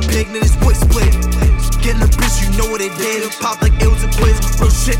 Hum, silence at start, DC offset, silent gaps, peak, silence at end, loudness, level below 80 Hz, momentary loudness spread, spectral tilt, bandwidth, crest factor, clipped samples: none; 0 s; under 0.1%; none; 0 dBFS; 0 s; -15 LUFS; -14 dBFS; 5 LU; -5 dB/octave; 17 kHz; 12 dB; under 0.1%